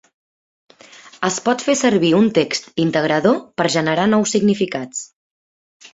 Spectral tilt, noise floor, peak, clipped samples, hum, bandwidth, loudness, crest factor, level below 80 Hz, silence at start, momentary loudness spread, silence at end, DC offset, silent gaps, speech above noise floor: -4.5 dB/octave; -44 dBFS; -2 dBFS; under 0.1%; none; 8 kHz; -17 LUFS; 16 dB; -58 dBFS; 1.05 s; 9 LU; 0.05 s; under 0.1%; 5.15-5.80 s; 27 dB